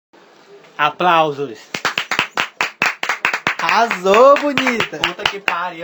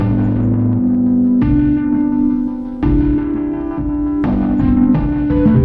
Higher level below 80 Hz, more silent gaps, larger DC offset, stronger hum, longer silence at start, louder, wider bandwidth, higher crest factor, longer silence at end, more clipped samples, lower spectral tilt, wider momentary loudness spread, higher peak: second, -56 dBFS vs -26 dBFS; neither; neither; neither; first, 0.55 s vs 0 s; about the same, -16 LUFS vs -15 LUFS; first, over 20 kHz vs 4.1 kHz; first, 18 dB vs 12 dB; about the same, 0 s vs 0 s; neither; second, -3 dB/octave vs -12 dB/octave; first, 10 LU vs 6 LU; about the same, 0 dBFS vs -2 dBFS